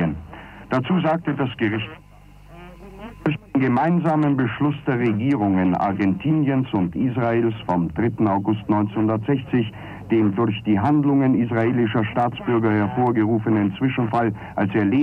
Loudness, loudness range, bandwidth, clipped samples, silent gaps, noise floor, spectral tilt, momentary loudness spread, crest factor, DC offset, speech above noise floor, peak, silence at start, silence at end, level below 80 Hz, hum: -21 LUFS; 4 LU; 5.6 kHz; under 0.1%; none; -45 dBFS; -9.5 dB/octave; 7 LU; 12 dB; under 0.1%; 25 dB; -8 dBFS; 0 s; 0 s; -50 dBFS; none